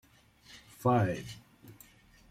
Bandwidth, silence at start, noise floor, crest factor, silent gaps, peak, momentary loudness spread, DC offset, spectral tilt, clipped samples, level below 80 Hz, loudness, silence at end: 16 kHz; 0.5 s; -60 dBFS; 20 dB; none; -14 dBFS; 26 LU; under 0.1%; -7 dB/octave; under 0.1%; -64 dBFS; -31 LUFS; 0.55 s